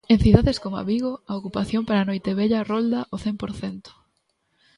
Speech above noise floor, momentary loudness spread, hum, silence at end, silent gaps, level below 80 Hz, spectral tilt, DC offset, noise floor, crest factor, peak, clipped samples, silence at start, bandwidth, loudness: 49 dB; 14 LU; none; 0.85 s; none; -36 dBFS; -7.5 dB/octave; under 0.1%; -71 dBFS; 22 dB; 0 dBFS; under 0.1%; 0.1 s; 11 kHz; -23 LUFS